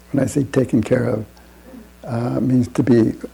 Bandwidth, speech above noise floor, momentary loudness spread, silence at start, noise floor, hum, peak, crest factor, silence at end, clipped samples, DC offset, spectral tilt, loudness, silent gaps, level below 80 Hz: 19 kHz; 24 dB; 11 LU; 0.15 s; -41 dBFS; none; -4 dBFS; 14 dB; 0.05 s; under 0.1%; under 0.1%; -8 dB/octave; -19 LUFS; none; -46 dBFS